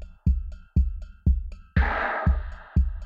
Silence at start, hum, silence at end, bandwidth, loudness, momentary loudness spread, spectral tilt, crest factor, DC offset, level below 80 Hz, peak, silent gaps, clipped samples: 0 s; none; 0 s; 4.9 kHz; -27 LUFS; 6 LU; -9 dB/octave; 16 dB; under 0.1%; -26 dBFS; -10 dBFS; none; under 0.1%